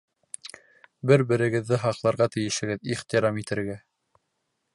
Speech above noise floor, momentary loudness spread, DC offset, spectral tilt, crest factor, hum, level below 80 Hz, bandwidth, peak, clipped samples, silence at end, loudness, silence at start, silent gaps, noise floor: 53 dB; 18 LU; under 0.1%; -5.5 dB/octave; 20 dB; none; -62 dBFS; 11.5 kHz; -6 dBFS; under 0.1%; 0.95 s; -25 LUFS; 0.45 s; none; -77 dBFS